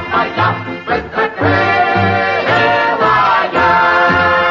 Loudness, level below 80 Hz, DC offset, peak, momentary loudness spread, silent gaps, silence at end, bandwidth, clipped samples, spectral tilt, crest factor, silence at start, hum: -12 LUFS; -44 dBFS; under 0.1%; -2 dBFS; 7 LU; none; 0 s; 7.4 kHz; under 0.1%; -6 dB/octave; 10 dB; 0 s; none